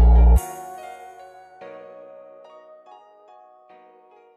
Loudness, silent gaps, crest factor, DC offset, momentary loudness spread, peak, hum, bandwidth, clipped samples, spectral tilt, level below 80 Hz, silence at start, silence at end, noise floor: -19 LUFS; none; 16 dB; under 0.1%; 29 LU; -6 dBFS; none; 13 kHz; under 0.1%; -8 dB/octave; -22 dBFS; 0 s; 3.75 s; -52 dBFS